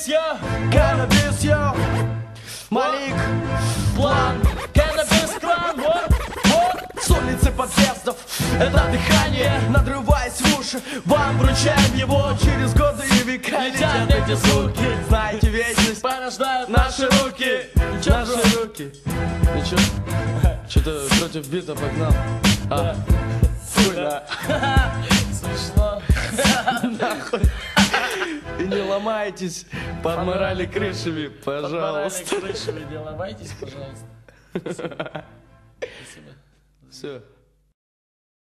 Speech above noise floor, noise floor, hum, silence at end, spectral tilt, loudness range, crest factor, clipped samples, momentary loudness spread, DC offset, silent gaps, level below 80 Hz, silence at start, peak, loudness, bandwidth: 36 dB; -56 dBFS; none; 1.35 s; -4.5 dB/octave; 11 LU; 18 dB; under 0.1%; 13 LU; under 0.1%; none; -28 dBFS; 0 s; -2 dBFS; -20 LUFS; 13 kHz